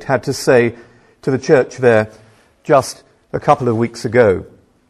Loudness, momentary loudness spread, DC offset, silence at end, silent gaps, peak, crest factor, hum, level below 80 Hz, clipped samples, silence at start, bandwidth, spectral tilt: -15 LUFS; 13 LU; under 0.1%; 0.45 s; none; 0 dBFS; 16 dB; none; -50 dBFS; under 0.1%; 0 s; 14 kHz; -6 dB/octave